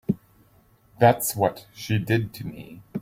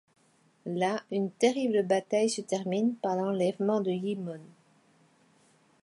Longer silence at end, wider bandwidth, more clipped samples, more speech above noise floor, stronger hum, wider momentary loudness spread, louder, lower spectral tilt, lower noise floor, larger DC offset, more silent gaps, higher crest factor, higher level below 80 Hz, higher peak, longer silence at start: second, 0 s vs 1.35 s; first, 16.5 kHz vs 11.5 kHz; neither; about the same, 35 dB vs 37 dB; neither; first, 18 LU vs 10 LU; first, -24 LUFS vs -29 LUFS; about the same, -5.5 dB/octave vs -5.5 dB/octave; second, -59 dBFS vs -65 dBFS; neither; neither; about the same, 20 dB vs 20 dB; first, -56 dBFS vs -82 dBFS; first, -4 dBFS vs -12 dBFS; second, 0.1 s vs 0.65 s